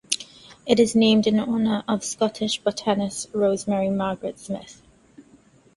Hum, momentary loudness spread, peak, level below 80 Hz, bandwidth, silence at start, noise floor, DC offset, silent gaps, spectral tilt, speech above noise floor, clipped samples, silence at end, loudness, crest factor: none; 15 LU; -2 dBFS; -58 dBFS; 11.5 kHz; 0.1 s; -55 dBFS; under 0.1%; none; -4.5 dB/octave; 33 dB; under 0.1%; 0.55 s; -23 LUFS; 22 dB